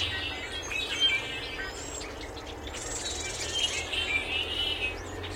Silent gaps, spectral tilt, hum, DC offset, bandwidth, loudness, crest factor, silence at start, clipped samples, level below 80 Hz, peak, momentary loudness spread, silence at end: none; -1.5 dB/octave; none; under 0.1%; 16.5 kHz; -30 LUFS; 18 dB; 0 s; under 0.1%; -48 dBFS; -14 dBFS; 12 LU; 0 s